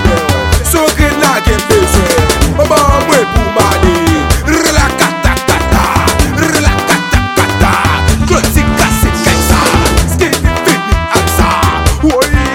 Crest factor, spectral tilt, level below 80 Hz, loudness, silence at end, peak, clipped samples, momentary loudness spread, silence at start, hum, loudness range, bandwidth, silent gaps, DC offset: 10 dB; -4.5 dB/octave; -16 dBFS; -9 LUFS; 0 s; 0 dBFS; 0.8%; 2 LU; 0 s; none; 1 LU; 17.5 kHz; none; under 0.1%